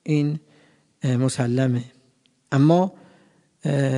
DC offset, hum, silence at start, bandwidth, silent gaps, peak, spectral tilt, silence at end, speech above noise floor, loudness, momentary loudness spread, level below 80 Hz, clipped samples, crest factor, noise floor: under 0.1%; none; 0.05 s; 11 kHz; none; -4 dBFS; -7 dB/octave; 0 s; 43 dB; -22 LUFS; 12 LU; -68 dBFS; under 0.1%; 18 dB; -63 dBFS